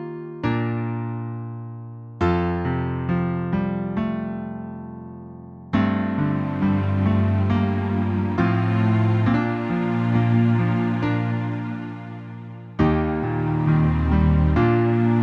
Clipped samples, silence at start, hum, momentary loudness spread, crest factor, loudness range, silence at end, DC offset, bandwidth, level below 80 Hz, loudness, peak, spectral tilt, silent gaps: under 0.1%; 0 s; none; 16 LU; 16 dB; 5 LU; 0 s; under 0.1%; 5.8 kHz; -36 dBFS; -22 LUFS; -6 dBFS; -10 dB/octave; none